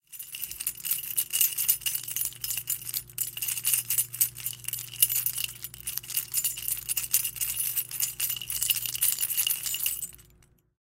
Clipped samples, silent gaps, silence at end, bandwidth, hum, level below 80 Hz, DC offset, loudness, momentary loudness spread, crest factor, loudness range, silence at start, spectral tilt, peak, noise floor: under 0.1%; none; 0.6 s; 16.5 kHz; 60 Hz at -55 dBFS; -60 dBFS; under 0.1%; -27 LUFS; 10 LU; 28 dB; 1 LU; 0.1 s; 1.5 dB/octave; -2 dBFS; -61 dBFS